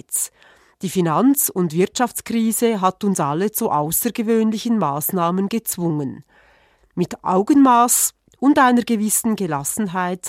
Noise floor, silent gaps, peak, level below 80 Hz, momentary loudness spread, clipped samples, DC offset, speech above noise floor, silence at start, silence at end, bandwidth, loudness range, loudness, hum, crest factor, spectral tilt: -56 dBFS; none; -2 dBFS; -60 dBFS; 9 LU; under 0.1%; under 0.1%; 37 dB; 0.1 s; 0 s; 16.5 kHz; 4 LU; -18 LUFS; none; 16 dB; -4.5 dB/octave